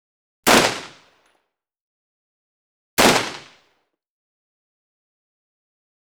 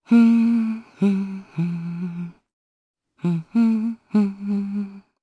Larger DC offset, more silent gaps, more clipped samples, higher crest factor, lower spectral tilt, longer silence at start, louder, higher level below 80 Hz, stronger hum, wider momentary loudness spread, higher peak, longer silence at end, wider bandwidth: neither; first, 1.81-2.97 s vs 2.53-2.94 s; neither; first, 22 dB vs 16 dB; second, -2 dB/octave vs -9 dB/octave; first, 0.45 s vs 0.1 s; first, -17 LUFS vs -22 LUFS; first, -52 dBFS vs -68 dBFS; neither; first, 17 LU vs 14 LU; first, -2 dBFS vs -6 dBFS; first, 2.75 s vs 0.2 s; first, over 20 kHz vs 5 kHz